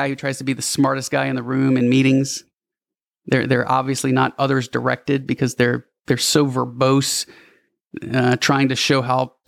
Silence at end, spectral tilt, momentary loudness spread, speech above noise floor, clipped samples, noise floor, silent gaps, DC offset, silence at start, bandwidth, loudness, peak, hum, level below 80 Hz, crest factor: 0.2 s; -4.5 dB/octave; 8 LU; 71 dB; under 0.1%; -90 dBFS; 7.81-7.85 s; under 0.1%; 0 s; 15.5 kHz; -19 LUFS; -2 dBFS; none; -62 dBFS; 16 dB